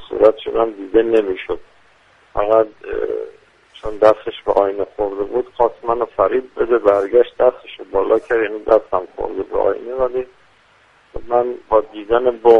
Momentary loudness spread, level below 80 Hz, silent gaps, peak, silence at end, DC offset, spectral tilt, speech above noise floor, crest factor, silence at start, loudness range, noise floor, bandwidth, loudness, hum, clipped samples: 12 LU; -44 dBFS; none; 0 dBFS; 0 s; under 0.1%; -6.5 dB/octave; 36 dB; 18 dB; 0 s; 4 LU; -52 dBFS; 6.2 kHz; -18 LUFS; none; under 0.1%